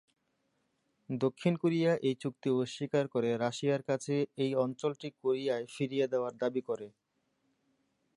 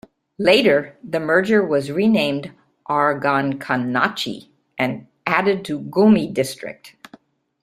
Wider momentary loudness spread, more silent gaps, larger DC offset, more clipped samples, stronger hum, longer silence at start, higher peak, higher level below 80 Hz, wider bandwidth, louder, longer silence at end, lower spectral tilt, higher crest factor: second, 7 LU vs 15 LU; neither; neither; neither; neither; first, 1.1 s vs 0.4 s; second, -16 dBFS vs -2 dBFS; second, -82 dBFS vs -60 dBFS; second, 11.5 kHz vs 14.5 kHz; second, -33 LUFS vs -19 LUFS; first, 1.3 s vs 0.75 s; about the same, -6.5 dB/octave vs -5.5 dB/octave; about the same, 18 dB vs 18 dB